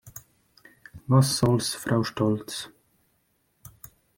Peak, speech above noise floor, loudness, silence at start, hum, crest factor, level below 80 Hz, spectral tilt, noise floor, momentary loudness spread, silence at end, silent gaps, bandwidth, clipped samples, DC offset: -6 dBFS; 47 dB; -25 LUFS; 0.05 s; none; 20 dB; -58 dBFS; -5.5 dB/octave; -70 dBFS; 24 LU; 1.5 s; none; 17 kHz; under 0.1%; under 0.1%